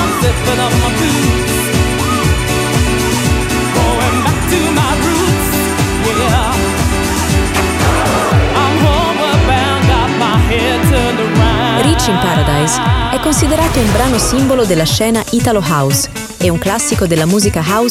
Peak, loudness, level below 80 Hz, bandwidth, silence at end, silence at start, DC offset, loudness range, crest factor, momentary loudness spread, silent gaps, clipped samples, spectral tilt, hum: 0 dBFS; -12 LUFS; -22 dBFS; 16.5 kHz; 0 s; 0 s; under 0.1%; 1 LU; 12 dB; 2 LU; none; under 0.1%; -4.5 dB/octave; none